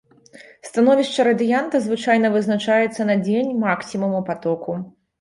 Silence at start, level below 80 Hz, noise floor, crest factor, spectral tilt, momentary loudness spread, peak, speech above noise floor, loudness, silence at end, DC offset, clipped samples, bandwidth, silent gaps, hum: 0.4 s; -64 dBFS; -46 dBFS; 16 dB; -6 dB/octave; 10 LU; -4 dBFS; 27 dB; -19 LUFS; 0.3 s; under 0.1%; under 0.1%; 11.5 kHz; none; none